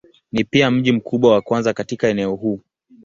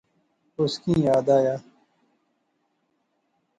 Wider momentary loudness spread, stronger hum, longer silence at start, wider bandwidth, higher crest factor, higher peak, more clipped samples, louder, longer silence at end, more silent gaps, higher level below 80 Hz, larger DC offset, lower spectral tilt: second, 9 LU vs 13 LU; neither; second, 0.35 s vs 0.6 s; second, 7.6 kHz vs 10.5 kHz; about the same, 16 dB vs 18 dB; first, -2 dBFS vs -8 dBFS; neither; first, -18 LUFS vs -23 LUFS; second, 0.45 s vs 2 s; neither; about the same, -54 dBFS vs -58 dBFS; neither; about the same, -6 dB/octave vs -7 dB/octave